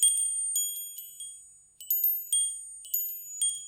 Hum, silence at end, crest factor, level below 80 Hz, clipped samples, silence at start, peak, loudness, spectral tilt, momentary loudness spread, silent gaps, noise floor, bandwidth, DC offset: none; 0 s; 22 dB; -80 dBFS; under 0.1%; 0 s; -8 dBFS; -27 LUFS; 5.5 dB/octave; 16 LU; none; -52 dBFS; 17 kHz; under 0.1%